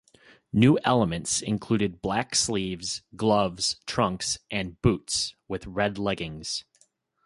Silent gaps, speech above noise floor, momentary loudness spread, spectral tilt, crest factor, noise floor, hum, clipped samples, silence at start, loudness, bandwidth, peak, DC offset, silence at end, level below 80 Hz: none; 39 dB; 10 LU; -4 dB/octave; 20 dB; -66 dBFS; none; under 0.1%; 0.55 s; -26 LUFS; 11.5 kHz; -6 dBFS; under 0.1%; 0.65 s; -50 dBFS